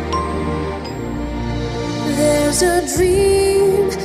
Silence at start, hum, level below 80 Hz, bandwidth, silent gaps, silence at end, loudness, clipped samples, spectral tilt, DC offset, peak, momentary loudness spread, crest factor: 0 s; none; -30 dBFS; 15 kHz; none; 0 s; -17 LUFS; under 0.1%; -4.5 dB/octave; under 0.1%; -4 dBFS; 10 LU; 14 dB